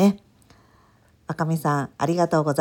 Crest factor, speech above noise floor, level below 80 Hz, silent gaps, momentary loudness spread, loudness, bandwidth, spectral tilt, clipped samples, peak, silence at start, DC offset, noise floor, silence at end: 18 dB; 36 dB; -62 dBFS; none; 15 LU; -23 LUFS; 17.5 kHz; -7 dB/octave; under 0.1%; -6 dBFS; 0 s; under 0.1%; -58 dBFS; 0 s